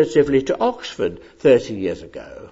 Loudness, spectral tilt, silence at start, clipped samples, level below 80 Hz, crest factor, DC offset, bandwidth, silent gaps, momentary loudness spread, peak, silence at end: -19 LUFS; -6 dB/octave; 0 s; under 0.1%; -50 dBFS; 16 dB; under 0.1%; 8 kHz; none; 16 LU; -2 dBFS; 0.05 s